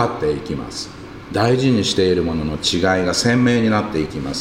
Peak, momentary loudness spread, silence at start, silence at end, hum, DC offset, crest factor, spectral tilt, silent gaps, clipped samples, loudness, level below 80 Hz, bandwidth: -2 dBFS; 11 LU; 0 s; 0 s; none; under 0.1%; 16 dB; -5 dB/octave; none; under 0.1%; -18 LUFS; -40 dBFS; 15.5 kHz